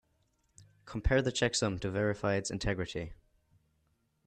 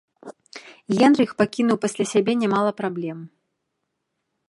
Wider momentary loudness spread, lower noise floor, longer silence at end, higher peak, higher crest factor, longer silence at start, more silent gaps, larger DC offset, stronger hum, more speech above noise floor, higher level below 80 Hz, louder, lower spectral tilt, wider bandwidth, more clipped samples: second, 11 LU vs 23 LU; about the same, -75 dBFS vs -78 dBFS; about the same, 1.1 s vs 1.2 s; second, -16 dBFS vs -4 dBFS; about the same, 20 dB vs 20 dB; first, 0.6 s vs 0.25 s; neither; neither; neither; second, 43 dB vs 57 dB; first, -44 dBFS vs -68 dBFS; second, -32 LUFS vs -21 LUFS; about the same, -4.5 dB/octave vs -5.5 dB/octave; second, 10 kHz vs 11.5 kHz; neither